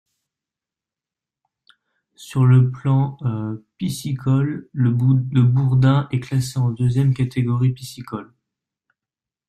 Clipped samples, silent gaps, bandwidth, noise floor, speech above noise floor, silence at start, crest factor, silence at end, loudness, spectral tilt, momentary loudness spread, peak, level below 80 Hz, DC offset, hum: under 0.1%; none; 13 kHz; -89 dBFS; 70 dB; 2.2 s; 16 dB; 1.25 s; -19 LUFS; -8 dB/octave; 12 LU; -4 dBFS; -52 dBFS; under 0.1%; none